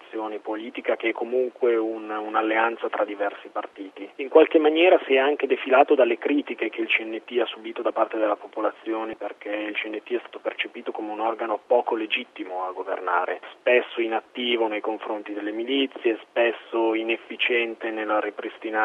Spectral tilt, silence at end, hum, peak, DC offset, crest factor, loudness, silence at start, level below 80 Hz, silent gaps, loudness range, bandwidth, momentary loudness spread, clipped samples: -5 dB/octave; 0 s; none; -2 dBFS; under 0.1%; 22 dB; -24 LUFS; 0 s; -80 dBFS; none; 7 LU; 4.5 kHz; 13 LU; under 0.1%